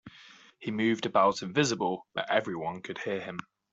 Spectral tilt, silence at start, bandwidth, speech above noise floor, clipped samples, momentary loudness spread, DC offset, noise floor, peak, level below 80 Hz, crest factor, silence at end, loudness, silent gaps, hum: -4.5 dB/octave; 0.05 s; 8.2 kHz; 25 dB; under 0.1%; 14 LU; under 0.1%; -55 dBFS; -10 dBFS; -70 dBFS; 20 dB; 0.3 s; -30 LUFS; none; none